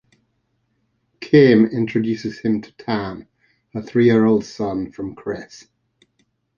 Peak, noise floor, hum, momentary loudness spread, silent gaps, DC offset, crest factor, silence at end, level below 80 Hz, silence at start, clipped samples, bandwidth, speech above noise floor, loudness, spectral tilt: -2 dBFS; -69 dBFS; none; 19 LU; none; under 0.1%; 20 dB; 1 s; -56 dBFS; 1.2 s; under 0.1%; 7 kHz; 51 dB; -18 LUFS; -7.5 dB/octave